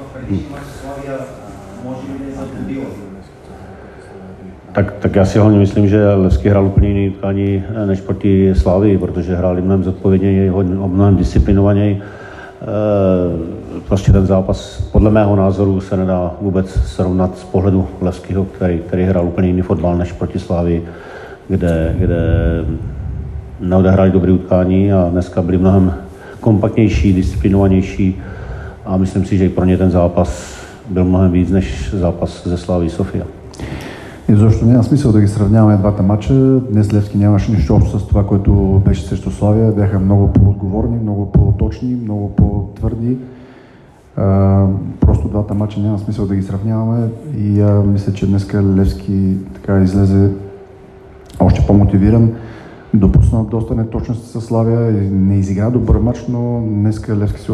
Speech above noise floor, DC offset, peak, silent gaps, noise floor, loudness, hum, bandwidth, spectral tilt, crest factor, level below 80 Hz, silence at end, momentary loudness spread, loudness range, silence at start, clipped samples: 29 dB; under 0.1%; 0 dBFS; none; -42 dBFS; -14 LUFS; none; 9.6 kHz; -9 dB/octave; 12 dB; -24 dBFS; 0 s; 15 LU; 4 LU; 0 s; under 0.1%